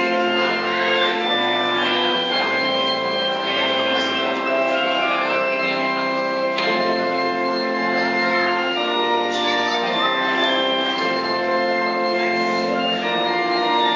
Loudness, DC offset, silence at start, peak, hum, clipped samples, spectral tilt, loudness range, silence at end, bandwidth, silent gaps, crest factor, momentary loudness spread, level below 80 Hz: -19 LUFS; under 0.1%; 0 s; -6 dBFS; none; under 0.1%; -3.5 dB/octave; 1 LU; 0 s; 7.6 kHz; none; 14 dB; 2 LU; -66 dBFS